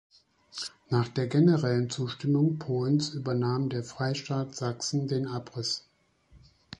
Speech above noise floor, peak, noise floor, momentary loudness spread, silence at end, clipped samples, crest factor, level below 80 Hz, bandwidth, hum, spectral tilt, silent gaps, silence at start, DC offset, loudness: 35 dB; -12 dBFS; -62 dBFS; 10 LU; 0.45 s; under 0.1%; 18 dB; -66 dBFS; 11 kHz; none; -6 dB/octave; none; 0.55 s; under 0.1%; -29 LUFS